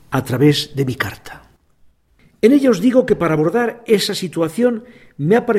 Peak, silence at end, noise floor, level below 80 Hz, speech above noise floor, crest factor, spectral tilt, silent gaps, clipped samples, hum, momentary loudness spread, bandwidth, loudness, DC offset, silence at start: 0 dBFS; 0 s; -54 dBFS; -50 dBFS; 38 dB; 16 dB; -6 dB/octave; none; under 0.1%; none; 10 LU; 16 kHz; -16 LUFS; under 0.1%; 0.1 s